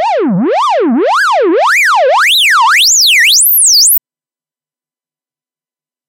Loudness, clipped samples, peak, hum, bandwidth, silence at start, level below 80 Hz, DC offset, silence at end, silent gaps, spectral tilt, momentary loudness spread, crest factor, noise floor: -6 LUFS; under 0.1%; 0 dBFS; none; 16 kHz; 0 s; -74 dBFS; under 0.1%; 2.1 s; none; -1 dB/octave; 7 LU; 10 dB; under -90 dBFS